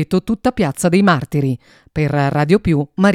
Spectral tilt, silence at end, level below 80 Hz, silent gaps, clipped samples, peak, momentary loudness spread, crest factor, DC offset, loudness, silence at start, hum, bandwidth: -6.5 dB/octave; 0 s; -40 dBFS; none; under 0.1%; 0 dBFS; 8 LU; 16 dB; under 0.1%; -16 LUFS; 0 s; none; 15 kHz